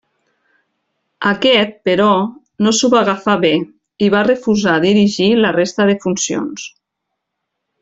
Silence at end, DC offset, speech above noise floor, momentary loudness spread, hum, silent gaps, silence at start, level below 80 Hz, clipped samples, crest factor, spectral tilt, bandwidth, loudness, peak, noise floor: 1.15 s; under 0.1%; 63 dB; 8 LU; none; none; 1.2 s; -56 dBFS; under 0.1%; 14 dB; -4.5 dB/octave; 8 kHz; -14 LUFS; -2 dBFS; -76 dBFS